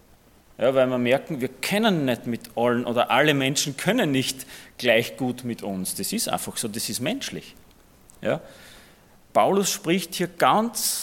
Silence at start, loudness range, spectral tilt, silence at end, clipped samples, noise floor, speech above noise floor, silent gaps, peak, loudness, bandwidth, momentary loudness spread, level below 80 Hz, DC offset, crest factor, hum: 0.6 s; 6 LU; -3.5 dB/octave; 0 s; under 0.1%; -55 dBFS; 31 dB; none; -4 dBFS; -24 LUFS; 17.5 kHz; 11 LU; -60 dBFS; under 0.1%; 20 dB; none